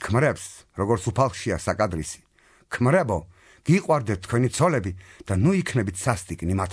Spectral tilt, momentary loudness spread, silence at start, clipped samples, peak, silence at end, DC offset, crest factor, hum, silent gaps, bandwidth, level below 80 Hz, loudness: -6 dB/octave; 13 LU; 0 s; under 0.1%; -6 dBFS; 0 s; under 0.1%; 18 dB; none; none; 11 kHz; -48 dBFS; -24 LUFS